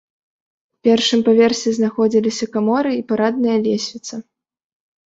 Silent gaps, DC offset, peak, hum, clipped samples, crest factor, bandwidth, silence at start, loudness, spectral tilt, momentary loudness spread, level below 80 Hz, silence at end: none; under 0.1%; -2 dBFS; none; under 0.1%; 16 dB; 8 kHz; 0.85 s; -17 LUFS; -4.5 dB/octave; 10 LU; -62 dBFS; 0.85 s